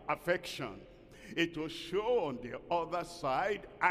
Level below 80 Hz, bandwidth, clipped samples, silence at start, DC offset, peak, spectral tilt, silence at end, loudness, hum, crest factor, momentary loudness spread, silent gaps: -62 dBFS; 15 kHz; under 0.1%; 0 s; under 0.1%; -14 dBFS; -4.5 dB/octave; 0 s; -36 LUFS; none; 22 dB; 10 LU; none